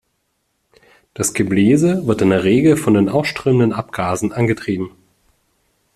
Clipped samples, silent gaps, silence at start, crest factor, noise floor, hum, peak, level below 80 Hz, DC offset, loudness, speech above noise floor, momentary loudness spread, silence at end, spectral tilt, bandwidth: under 0.1%; none; 1.2 s; 16 dB; -68 dBFS; none; -2 dBFS; -50 dBFS; under 0.1%; -16 LUFS; 53 dB; 9 LU; 1.05 s; -6 dB/octave; 14 kHz